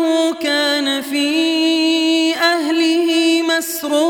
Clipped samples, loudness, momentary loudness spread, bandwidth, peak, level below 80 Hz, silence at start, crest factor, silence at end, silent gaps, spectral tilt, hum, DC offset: under 0.1%; -15 LUFS; 3 LU; 18.5 kHz; -2 dBFS; -70 dBFS; 0 s; 12 dB; 0 s; none; -0.5 dB/octave; none; under 0.1%